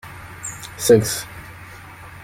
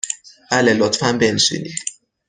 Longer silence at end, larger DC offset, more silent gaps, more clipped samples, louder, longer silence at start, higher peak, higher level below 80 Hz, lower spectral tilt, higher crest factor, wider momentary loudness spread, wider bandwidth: second, 0 s vs 0.35 s; neither; neither; neither; about the same, -19 LUFS vs -17 LUFS; about the same, 0.05 s vs 0.05 s; about the same, -2 dBFS vs -2 dBFS; first, -50 dBFS vs -56 dBFS; first, -4.5 dB/octave vs -3 dB/octave; about the same, 20 dB vs 18 dB; first, 23 LU vs 12 LU; first, 16.5 kHz vs 10 kHz